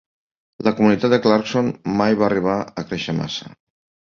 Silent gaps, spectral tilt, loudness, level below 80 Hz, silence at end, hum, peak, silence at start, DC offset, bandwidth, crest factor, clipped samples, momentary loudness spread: none; -6.5 dB/octave; -19 LUFS; -54 dBFS; 0.55 s; none; -2 dBFS; 0.6 s; under 0.1%; 7.2 kHz; 18 dB; under 0.1%; 10 LU